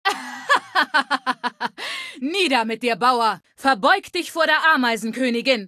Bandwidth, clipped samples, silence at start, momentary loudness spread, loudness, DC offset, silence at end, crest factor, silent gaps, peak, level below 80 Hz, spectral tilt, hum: 14.5 kHz; under 0.1%; 0.05 s; 10 LU; -20 LUFS; under 0.1%; 0 s; 18 dB; none; -2 dBFS; -70 dBFS; -2.5 dB/octave; none